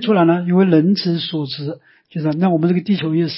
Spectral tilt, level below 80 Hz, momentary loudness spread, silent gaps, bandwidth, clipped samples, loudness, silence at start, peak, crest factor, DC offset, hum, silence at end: -11 dB/octave; -64 dBFS; 13 LU; none; 5.8 kHz; under 0.1%; -17 LUFS; 0 s; -2 dBFS; 14 dB; under 0.1%; none; 0 s